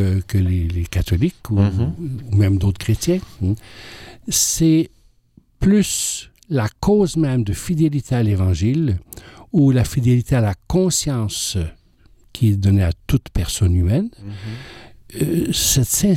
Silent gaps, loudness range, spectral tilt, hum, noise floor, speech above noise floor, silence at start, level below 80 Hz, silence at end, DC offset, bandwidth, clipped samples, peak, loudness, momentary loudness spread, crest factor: none; 2 LU; -5.5 dB/octave; none; -54 dBFS; 36 dB; 0 s; -34 dBFS; 0 s; under 0.1%; 16.5 kHz; under 0.1%; -6 dBFS; -19 LUFS; 13 LU; 12 dB